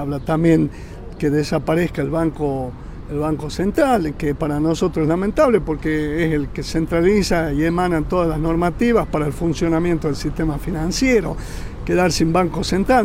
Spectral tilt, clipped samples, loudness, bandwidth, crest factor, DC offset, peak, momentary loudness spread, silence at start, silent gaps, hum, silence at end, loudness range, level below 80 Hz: -6 dB/octave; under 0.1%; -19 LUFS; 16 kHz; 14 dB; under 0.1%; -4 dBFS; 8 LU; 0 s; none; none; 0 s; 2 LU; -32 dBFS